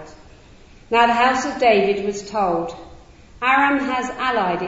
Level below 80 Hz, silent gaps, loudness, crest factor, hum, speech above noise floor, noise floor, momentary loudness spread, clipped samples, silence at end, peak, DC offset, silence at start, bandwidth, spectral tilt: -48 dBFS; none; -19 LUFS; 18 dB; none; 27 dB; -46 dBFS; 9 LU; under 0.1%; 0 s; -2 dBFS; under 0.1%; 0 s; 8 kHz; -4 dB/octave